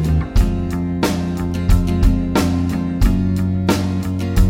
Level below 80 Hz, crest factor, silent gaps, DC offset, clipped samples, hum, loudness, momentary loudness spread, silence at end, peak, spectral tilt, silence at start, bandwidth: -20 dBFS; 14 dB; none; under 0.1%; under 0.1%; none; -18 LUFS; 4 LU; 0 s; -2 dBFS; -7 dB/octave; 0 s; 16.5 kHz